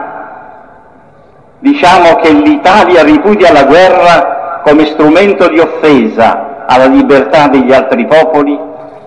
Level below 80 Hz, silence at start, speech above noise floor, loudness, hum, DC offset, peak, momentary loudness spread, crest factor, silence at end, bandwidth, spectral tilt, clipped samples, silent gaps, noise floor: -38 dBFS; 0 s; 35 dB; -5 LUFS; none; 0.6%; 0 dBFS; 9 LU; 6 dB; 0.05 s; 10.5 kHz; -5.5 dB/octave; 4%; none; -39 dBFS